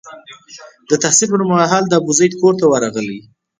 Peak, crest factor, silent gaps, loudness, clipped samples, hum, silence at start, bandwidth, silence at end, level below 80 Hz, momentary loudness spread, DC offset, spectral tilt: 0 dBFS; 16 dB; none; -14 LUFS; under 0.1%; none; 0.05 s; 10 kHz; 0.4 s; -60 dBFS; 10 LU; under 0.1%; -4 dB/octave